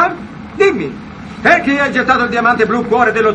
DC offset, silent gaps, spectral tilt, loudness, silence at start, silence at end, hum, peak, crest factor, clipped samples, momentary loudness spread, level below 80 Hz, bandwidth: under 0.1%; none; -5.5 dB/octave; -13 LUFS; 0 s; 0 s; none; 0 dBFS; 14 dB; under 0.1%; 17 LU; -42 dBFS; 9.8 kHz